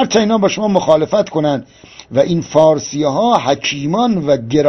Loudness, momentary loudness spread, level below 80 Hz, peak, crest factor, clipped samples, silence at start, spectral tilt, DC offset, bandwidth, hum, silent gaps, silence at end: -14 LUFS; 5 LU; -48 dBFS; 0 dBFS; 14 dB; 0.1%; 0 s; -5.5 dB/octave; under 0.1%; 6.4 kHz; none; none; 0 s